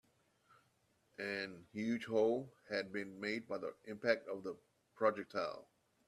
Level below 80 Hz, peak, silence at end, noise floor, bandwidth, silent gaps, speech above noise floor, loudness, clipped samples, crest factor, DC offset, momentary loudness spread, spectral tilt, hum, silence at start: -82 dBFS; -20 dBFS; 0.45 s; -77 dBFS; 12.5 kHz; none; 37 dB; -40 LUFS; under 0.1%; 22 dB; under 0.1%; 11 LU; -5.5 dB/octave; none; 1.2 s